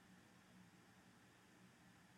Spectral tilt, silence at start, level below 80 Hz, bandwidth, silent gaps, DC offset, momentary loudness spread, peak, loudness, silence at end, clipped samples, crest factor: -4 dB/octave; 0 s; -90 dBFS; 14.5 kHz; none; under 0.1%; 1 LU; -56 dBFS; -68 LUFS; 0 s; under 0.1%; 12 dB